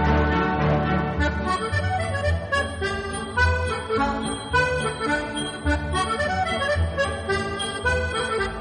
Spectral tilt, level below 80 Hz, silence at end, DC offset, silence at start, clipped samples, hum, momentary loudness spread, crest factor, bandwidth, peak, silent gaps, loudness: -5 dB/octave; -32 dBFS; 0 s; under 0.1%; 0 s; under 0.1%; none; 5 LU; 16 dB; 10 kHz; -8 dBFS; none; -24 LUFS